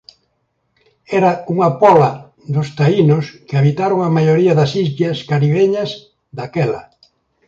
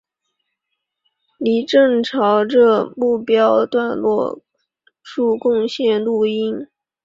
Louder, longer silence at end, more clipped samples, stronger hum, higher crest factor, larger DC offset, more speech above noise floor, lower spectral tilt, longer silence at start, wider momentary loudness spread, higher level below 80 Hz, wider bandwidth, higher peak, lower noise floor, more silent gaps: about the same, -15 LUFS vs -17 LUFS; first, 0.65 s vs 0.4 s; neither; neither; about the same, 16 dB vs 16 dB; neither; second, 53 dB vs 61 dB; first, -8 dB/octave vs -6 dB/octave; second, 1.1 s vs 1.4 s; about the same, 12 LU vs 10 LU; first, -56 dBFS vs -64 dBFS; about the same, 7.6 kHz vs 7.6 kHz; about the same, 0 dBFS vs -2 dBFS; second, -67 dBFS vs -77 dBFS; neither